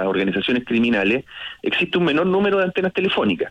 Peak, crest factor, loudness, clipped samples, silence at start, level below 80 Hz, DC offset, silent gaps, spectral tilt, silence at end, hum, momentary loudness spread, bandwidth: -8 dBFS; 10 dB; -19 LUFS; under 0.1%; 0 s; -54 dBFS; under 0.1%; none; -7 dB/octave; 0 s; none; 5 LU; 8.4 kHz